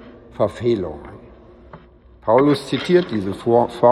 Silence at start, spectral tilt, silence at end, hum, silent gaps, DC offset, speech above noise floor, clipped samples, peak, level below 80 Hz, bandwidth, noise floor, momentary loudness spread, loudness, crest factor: 0.05 s; -7 dB/octave; 0 s; none; none; under 0.1%; 29 dB; under 0.1%; -2 dBFS; -50 dBFS; 12 kHz; -46 dBFS; 17 LU; -19 LUFS; 18 dB